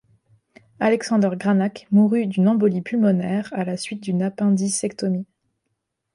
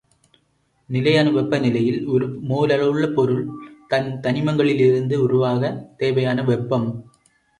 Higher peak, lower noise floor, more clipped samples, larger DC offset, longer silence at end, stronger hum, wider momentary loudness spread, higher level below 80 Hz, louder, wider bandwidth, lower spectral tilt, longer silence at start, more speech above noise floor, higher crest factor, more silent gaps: second, -8 dBFS vs -4 dBFS; first, -76 dBFS vs -65 dBFS; neither; neither; first, 0.9 s vs 0.55 s; neither; about the same, 8 LU vs 8 LU; second, -66 dBFS vs -58 dBFS; about the same, -21 LUFS vs -20 LUFS; about the same, 11.5 kHz vs 10.5 kHz; about the same, -6.5 dB/octave vs -7.5 dB/octave; about the same, 0.8 s vs 0.9 s; first, 57 dB vs 46 dB; about the same, 14 dB vs 16 dB; neither